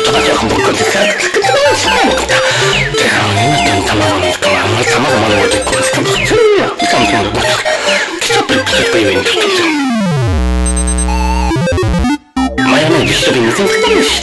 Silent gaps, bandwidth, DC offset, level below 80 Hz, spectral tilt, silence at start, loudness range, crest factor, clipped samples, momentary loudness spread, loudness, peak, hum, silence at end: none; 12 kHz; under 0.1%; -22 dBFS; -3.5 dB/octave; 0 s; 2 LU; 10 dB; under 0.1%; 4 LU; -10 LUFS; 0 dBFS; none; 0 s